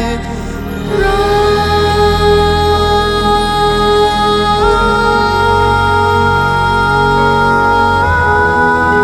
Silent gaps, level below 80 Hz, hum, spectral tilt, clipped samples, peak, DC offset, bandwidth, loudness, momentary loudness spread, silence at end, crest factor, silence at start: none; -24 dBFS; none; -5.5 dB/octave; under 0.1%; 0 dBFS; under 0.1%; 16 kHz; -11 LUFS; 2 LU; 0 s; 10 dB; 0 s